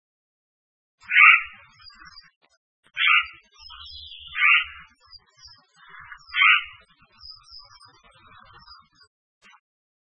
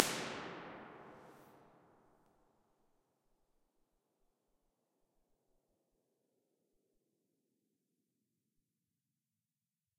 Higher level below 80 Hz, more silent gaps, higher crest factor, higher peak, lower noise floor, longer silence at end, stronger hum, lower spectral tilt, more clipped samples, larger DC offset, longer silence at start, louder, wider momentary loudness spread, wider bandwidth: first, -62 dBFS vs -84 dBFS; first, 2.36-2.41 s, 2.57-2.83 s vs none; second, 26 dB vs 48 dB; about the same, 0 dBFS vs -2 dBFS; second, -54 dBFS vs under -90 dBFS; second, 2.7 s vs 8.25 s; neither; second, 0.5 dB/octave vs -2 dB/octave; neither; neither; first, 1.1 s vs 0 s; first, -17 LUFS vs -44 LUFS; first, 26 LU vs 23 LU; second, 9 kHz vs 15.5 kHz